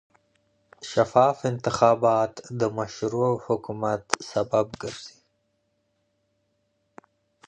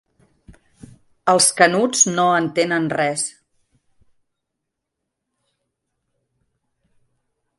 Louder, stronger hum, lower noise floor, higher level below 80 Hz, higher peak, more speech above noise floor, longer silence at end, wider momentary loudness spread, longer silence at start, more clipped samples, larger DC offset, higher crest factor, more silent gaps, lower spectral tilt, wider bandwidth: second, -24 LUFS vs -17 LUFS; neither; second, -73 dBFS vs -80 dBFS; about the same, -62 dBFS vs -62 dBFS; about the same, -2 dBFS vs 0 dBFS; second, 48 dB vs 63 dB; second, 2.4 s vs 4.3 s; first, 14 LU vs 10 LU; first, 0.8 s vs 0.5 s; neither; neither; about the same, 24 dB vs 22 dB; neither; first, -5.5 dB/octave vs -2.5 dB/octave; second, 10 kHz vs 12 kHz